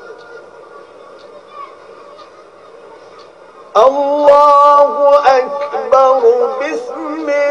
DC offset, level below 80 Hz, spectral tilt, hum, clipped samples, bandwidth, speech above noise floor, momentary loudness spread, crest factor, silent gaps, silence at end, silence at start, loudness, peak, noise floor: 0.1%; -60 dBFS; -3.5 dB/octave; none; 0.7%; 8 kHz; 29 dB; 24 LU; 14 dB; none; 0 s; 0 s; -11 LUFS; 0 dBFS; -39 dBFS